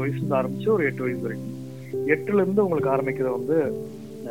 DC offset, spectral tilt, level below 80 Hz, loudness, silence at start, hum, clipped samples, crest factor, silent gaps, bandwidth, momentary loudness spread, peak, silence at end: 0.3%; -8.5 dB/octave; -64 dBFS; -24 LUFS; 0 s; none; under 0.1%; 18 dB; none; 17 kHz; 12 LU; -6 dBFS; 0 s